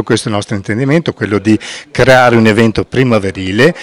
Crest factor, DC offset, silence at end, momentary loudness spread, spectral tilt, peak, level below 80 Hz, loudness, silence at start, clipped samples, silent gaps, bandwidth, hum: 10 dB; under 0.1%; 0 s; 10 LU; -6 dB/octave; 0 dBFS; -38 dBFS; -11 LUFS; 0 s; 2%; none; 15.5 kHz; none